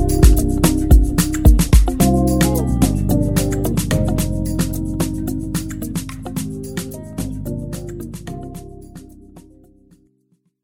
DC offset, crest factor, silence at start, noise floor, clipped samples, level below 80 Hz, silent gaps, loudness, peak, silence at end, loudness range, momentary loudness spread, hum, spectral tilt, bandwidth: 0.4%; 16 dB; 0 s; -63 dBFS; under 0.1%; -20 dBFS; none; -18 LUFS; 0 dBFS; 1.25 s; 15 LU; 16 LU; none; -6 dB/octave; 17 kHz